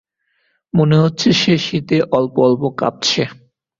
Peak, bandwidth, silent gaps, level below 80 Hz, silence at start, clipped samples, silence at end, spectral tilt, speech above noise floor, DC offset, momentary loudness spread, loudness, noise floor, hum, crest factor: -2 dBFS; 7.6 kHz; none; -52 dBFS; 0.75 s; under 0.1%; 0.45 s; -5.5 dB/octave; 51 dB; under 0.1%; 6 LU; -15 LUFS; -65 dBFS; none; 14 dB